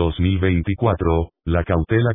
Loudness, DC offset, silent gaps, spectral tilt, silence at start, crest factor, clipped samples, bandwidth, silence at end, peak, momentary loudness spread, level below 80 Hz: -20 LUFS; under 0.1%; none; -12 dB/octave; 0 s; 16 dB; under 0.1%; 3.8 kHz; 0 s; -4 dBFS; 4 LU; -30 dBFS